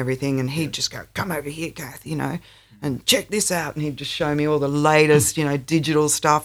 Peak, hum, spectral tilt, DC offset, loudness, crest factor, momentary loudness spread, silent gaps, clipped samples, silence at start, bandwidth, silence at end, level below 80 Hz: -2 dBFS; none; -4 dB/octave; under 0.1%; -21 LUFS; 20 dB; 14 LU; none; under 0.1%; 0 s; over 20 kHz; 0 s; -52 dBFS